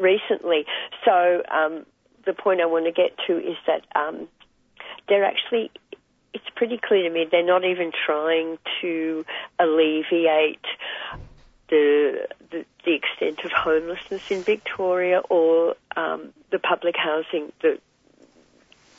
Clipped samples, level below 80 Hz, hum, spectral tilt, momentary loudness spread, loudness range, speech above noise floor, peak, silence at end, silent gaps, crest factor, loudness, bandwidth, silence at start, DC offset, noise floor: under 0.1%; -60 dBFS; none; -5.5 dB/octave; 14 LU; 3 LU; 34 dB; -4 dBFS; 1.2 s; none; 18 dB; -22 LUFS; 7.4 kHz; 0 s; under 0.1%; -56 dBFS